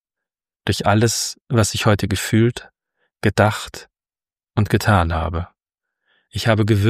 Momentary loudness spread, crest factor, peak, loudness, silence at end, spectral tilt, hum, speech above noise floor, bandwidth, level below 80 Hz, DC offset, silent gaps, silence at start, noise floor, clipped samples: 13 LU; 18 dB; -2 dBFS; -19 LUFS; 0 s; -5 dB/octave; none; over 72 dB; 15.5 kHz; -40 dBFS; under 0.1%; none; 0.65 s; under -90 dBFS; under 0.1%